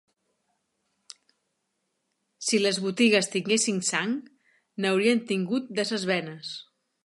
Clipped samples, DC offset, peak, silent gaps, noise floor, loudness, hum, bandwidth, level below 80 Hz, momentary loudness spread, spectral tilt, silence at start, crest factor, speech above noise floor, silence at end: under 0.1%; under 0.1%; -8 dBFS; none; -78 dBFS; -25 LUFS; none; 11.5 kHz; -80 dBFS; 14 LU; -3.5 dB/octave; 2.4 s; 20 dB; 53 dB; 0.45 s